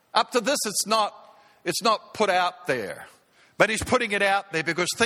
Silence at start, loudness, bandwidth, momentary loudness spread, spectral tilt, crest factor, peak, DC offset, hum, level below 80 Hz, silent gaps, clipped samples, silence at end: 0.15 s; -24 LUFS; 17 kHz; 7 LU; -2.5 dB/octave; 24 dB; -2 dBFS; under 0.1%; none; -56 dBFS; none; under 0.1%; 0 s